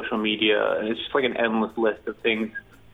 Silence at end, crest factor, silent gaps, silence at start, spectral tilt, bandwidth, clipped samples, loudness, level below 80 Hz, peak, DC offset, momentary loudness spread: 0.35 s; 16 dB; none; 0 s; -6.5 dB/octave; 4.3 kHz; under 0.1%; -24 LUFS; -60 dBFS; -8 dBFS; under 0.1%; 6 LU